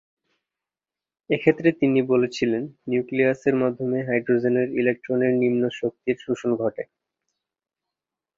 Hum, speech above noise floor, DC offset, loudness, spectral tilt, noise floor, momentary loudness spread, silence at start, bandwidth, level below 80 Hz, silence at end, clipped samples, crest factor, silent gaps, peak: none; over 68 dB; under 0.1%; -23 LUFS; -7 dB/octave; under -90 dBFS; 8 LU; 1.3 s; 7.4 kHz; -66 dBFS; 1.55 s; under 0.1%; 20 dB; none; -4 dBFS